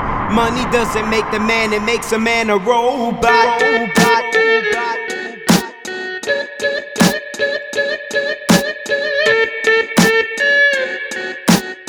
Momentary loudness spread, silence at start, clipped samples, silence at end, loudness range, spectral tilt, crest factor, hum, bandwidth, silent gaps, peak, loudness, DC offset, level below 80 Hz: 8 LU; 0 s; under 0.1%; 0 s; 4 LU; -4 dB/octave; 16 dB; none; over 20 kHz; none; 0 dBFS; -15 LUFS; under 0.1%; -40 dBFS